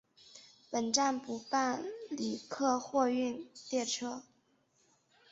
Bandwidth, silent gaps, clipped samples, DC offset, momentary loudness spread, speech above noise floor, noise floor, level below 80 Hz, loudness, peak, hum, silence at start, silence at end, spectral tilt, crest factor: 8 kHz; none; under 0.1%; under 0.1%; 14 LU; 38 dB; -73 dBFS; -78 dBFS; -34 LUFS; -16 dBFS; none; 0.35 s; 1.1 s; -2 dB/octave; 20 dB